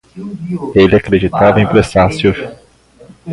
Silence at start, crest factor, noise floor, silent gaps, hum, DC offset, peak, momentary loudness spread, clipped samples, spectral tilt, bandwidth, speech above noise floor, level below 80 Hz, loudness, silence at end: 0.15 s; 12 dB; -43 dBFS; none; none; under 0.1%; 0 dBFS; 15 LU; under 0.1%; -7 dB/octave; 11.5 kHz; 31 dB; -32 dBFS; -11 LUFS; 0 s